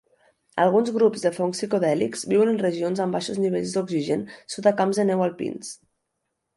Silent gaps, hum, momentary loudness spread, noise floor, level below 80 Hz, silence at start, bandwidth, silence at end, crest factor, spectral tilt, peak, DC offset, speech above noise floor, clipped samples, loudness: none; none; 11 LU; -79 dBFS; -68 dBFS; 0.55 s; 11.5 kHz; 0.8 s; 18 dB; -5.5 dB/octave; -6 dBFS; under 0.1%; 56 dB; under 0.1%; -23 LUFS